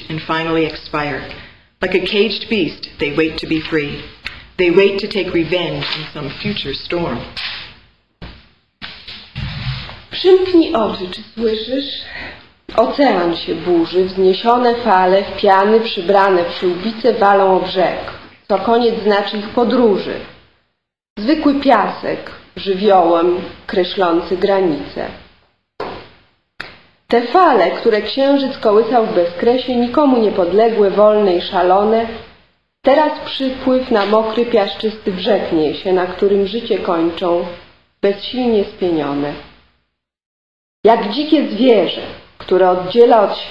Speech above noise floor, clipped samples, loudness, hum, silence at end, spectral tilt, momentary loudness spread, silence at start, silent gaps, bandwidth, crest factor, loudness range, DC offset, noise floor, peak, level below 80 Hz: 54 dB; under 0.1%; -15 LUFS; none; 0 s; -7 dB/octave; 15 LU; 0 s; 21.10-21.16 s, 40.26-40.83 s; 7.6 kHz; 16 dB; 6 LU; 0.7%; -69 dBFS; 0 dBFS; -46 dBFS